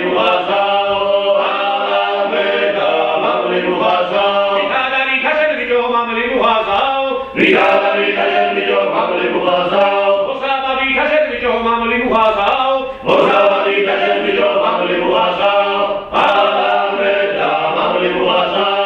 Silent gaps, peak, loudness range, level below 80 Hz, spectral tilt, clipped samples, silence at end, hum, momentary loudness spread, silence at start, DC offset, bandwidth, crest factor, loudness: none; 0 dBFS; 1 LU; -48 dBFS; -5.5 dB/octave; under 0.1%; 0 s; none; 4 LU; 0 s; under 0.1%; 7 kHz; 14 dB; -14 LUFS